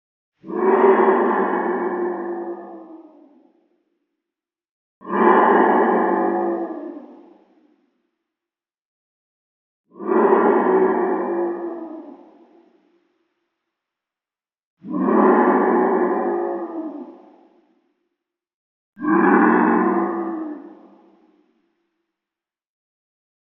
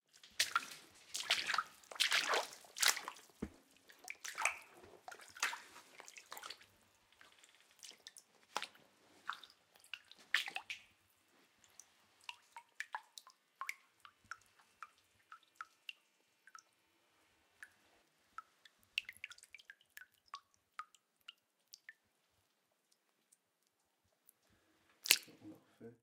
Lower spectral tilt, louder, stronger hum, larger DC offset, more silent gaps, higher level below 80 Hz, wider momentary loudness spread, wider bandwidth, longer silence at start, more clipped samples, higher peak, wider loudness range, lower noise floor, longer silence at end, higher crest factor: first, -6.5 dB/octave vs 1 dB/octave; first, -18 LUFS vs -40 LUFS; neither; neither; first, 4.71-5.01 s, 8.85-9.84 s, 14.65-14.77 s, 18.54-18.93 s vs none; second, -86 dBFS vs -80 dBFS; second, 18 LU vs 26 LU; second, 3.6 kHz vs 17 kHz; first, 0.45 s vs 0.25 s; neither; first, -2 dBFS vs -10 dBFS; second, 13 LU vs 21 LU; first, under -90 dBFS vs -82 dBFS; first, 2.75 s vs 0.1 s; second, 20 dB vs 36 dB